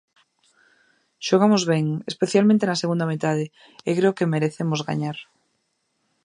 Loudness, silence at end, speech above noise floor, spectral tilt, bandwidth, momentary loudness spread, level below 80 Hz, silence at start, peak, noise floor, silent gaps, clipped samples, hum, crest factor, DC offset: -22 LUFS; 1 s; 51 dB; -6 dB/octave; 11 kHz; 12 LU; -70 dBFS; 1.2 s; -4 dBFS; -72 dBFS; none; under 0.1%; none; 18 dB; under 0.1%